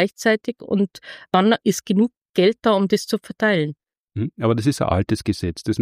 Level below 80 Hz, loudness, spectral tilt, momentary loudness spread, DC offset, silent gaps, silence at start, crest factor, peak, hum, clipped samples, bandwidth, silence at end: -48 dBFS; -21 LUFS; -5.5 dB/octave; 9 LU; under 0.1%; 2.17-2.34 s, 3.98-4.08 s; 0 s; 16 dB; -4 dBFS; none; under 0.1%; 15.5 kHz; 0 s